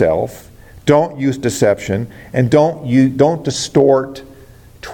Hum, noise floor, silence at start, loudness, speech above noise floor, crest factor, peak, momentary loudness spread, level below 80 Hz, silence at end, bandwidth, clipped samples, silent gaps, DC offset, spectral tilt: none; -41 dBFS; 0 s; -15 LUFS; 27 dB; 14 dB; 0 dBFS; 10 LU; -46 dBFS; 0 s; 17 kHz; under 0.1%; none; under 0.1%; -6 dB/octave